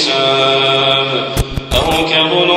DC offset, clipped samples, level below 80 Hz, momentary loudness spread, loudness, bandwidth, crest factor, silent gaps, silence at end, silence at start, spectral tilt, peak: under 0.1%; under 0.1%; -28 dBFS; 6 LU; -12 LUFS; 16 kHz; 12 dB; none; 0 s; 0 s; -4 dB/octave; 0 dBFS